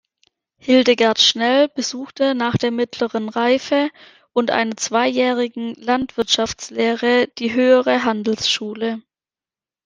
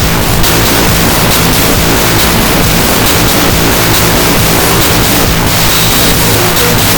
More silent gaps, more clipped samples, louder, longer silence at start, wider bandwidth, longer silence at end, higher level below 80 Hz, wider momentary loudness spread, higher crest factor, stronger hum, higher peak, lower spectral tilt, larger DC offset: neither; second, under 0.1% vs 1%; second, -18 LUFS vs -6 LUFS; first, 0.65 s vs 0 s; second, 10 kHz vs over 20 kHz; first, 0.85 s vs 0 s; second, -58 dBFS vs -18 dBFS; first, 10 LU vs 1 LU; first, 16 dB vs 8 dB; neither; about the same, -2 dBFS vs 0 dBFS; about the same, -3.5 dB/octave vs -3.5 dB/octave; second, under 0.1% vs 2%